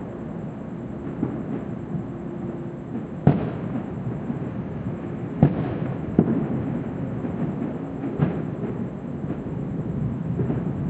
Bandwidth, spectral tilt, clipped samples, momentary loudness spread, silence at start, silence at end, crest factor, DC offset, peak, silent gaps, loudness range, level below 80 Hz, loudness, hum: 7.8 kHz; -10.5 dB/octave; under 0.1%; 11 LU; 0 s; 0 s; 24 dB; under 0.1%; -2 dBFS; none; 3 LU; -46 dBFS; -27 LUFS; none